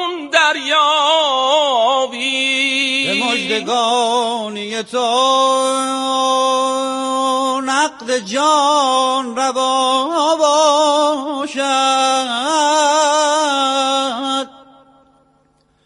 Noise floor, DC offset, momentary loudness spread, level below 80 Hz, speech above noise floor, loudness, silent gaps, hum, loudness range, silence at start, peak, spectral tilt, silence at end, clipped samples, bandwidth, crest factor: -58 dBFS; under 0.1%; 6 LU; -66 dBFS; 42 dB; -15 LUFS; none; none; 2 LU; 0 s; 0 dBFS; -1 dB/octave; 1.35 s; under 0.1%; 11.5 kHz; 16 dB